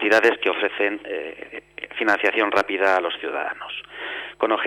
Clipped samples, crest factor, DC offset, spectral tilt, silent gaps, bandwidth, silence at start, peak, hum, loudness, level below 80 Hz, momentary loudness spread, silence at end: under 0.1%; 18 dB; under 0.1%; -3 dB/octave; none; 15.5 kHz; 0 s; -6 dBFS; none; -22 LUFS; -64 dBFS; 14 LU; 0 s